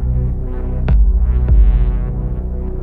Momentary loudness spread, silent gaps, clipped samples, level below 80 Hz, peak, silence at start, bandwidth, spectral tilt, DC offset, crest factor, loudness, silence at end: 10 LU; none; under 0.1%; -14 dBFS; -2 dBFS; 0 s; 2.9 kHz; -11.5 dB/octave; under 0.1%; 12 dB; -17 LUFS; 0 s